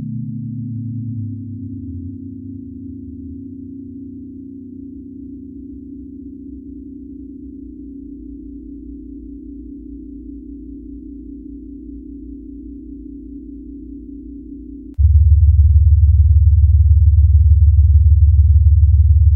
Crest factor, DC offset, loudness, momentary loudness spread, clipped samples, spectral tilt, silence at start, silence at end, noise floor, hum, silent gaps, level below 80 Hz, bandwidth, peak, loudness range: 14 dB; under 0.1%; -13 LUFS; 22 LU; under 0.1%; -16.5 dB/octave; 0 s; 0 s; -33 dBFS; none; none; -18 dBFS; 0.4 kHz; -2 dBFS; 22 LU